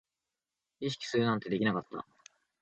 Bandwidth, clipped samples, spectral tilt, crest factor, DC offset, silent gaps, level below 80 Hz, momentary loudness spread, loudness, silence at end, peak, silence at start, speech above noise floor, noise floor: 8.8 kHz; under 0.1%; -6 dB/octave; 20 dB; under 0.1%; none; -72 dBFS; 15 LU; -33 LUFS; 0.6 s; -16 dBFS; 0.8 s; 57 dB; -90 dBFS